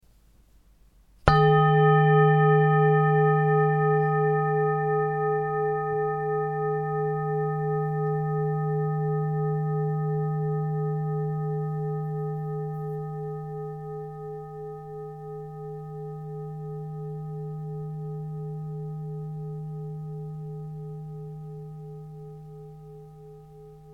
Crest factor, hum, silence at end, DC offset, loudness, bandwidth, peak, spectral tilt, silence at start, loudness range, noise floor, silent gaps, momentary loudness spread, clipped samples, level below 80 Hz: 26 dB; none; 0 s; under 0.1%; -26 LUFS; 5 kHz; 0 dBFS; -9.5 dB/octave; 1.25 s; 17 LU; -58 dBFS; none; 19 LU; under 0.1%; -50 dBFS